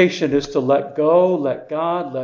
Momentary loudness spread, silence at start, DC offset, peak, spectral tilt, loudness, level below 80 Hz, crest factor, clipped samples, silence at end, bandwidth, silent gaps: 7 LU; 0 s; under 0.1%; -2 dBFS; -6.5 dB/octave; -18 LUFS; -56 dBFS; 16 dB; under 0.1%; 0 s; 7.4 kHz; none